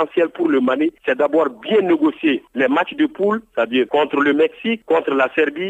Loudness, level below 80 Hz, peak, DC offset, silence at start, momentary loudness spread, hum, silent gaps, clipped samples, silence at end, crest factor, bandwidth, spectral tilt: -18 LUFS; -66 dBFS; -4 dBFS; under 0.1%; 0 s; 4 LU; none; none; under 0.1%; 0 s; 14 dB; 8 kHz; -6.5 dB/octave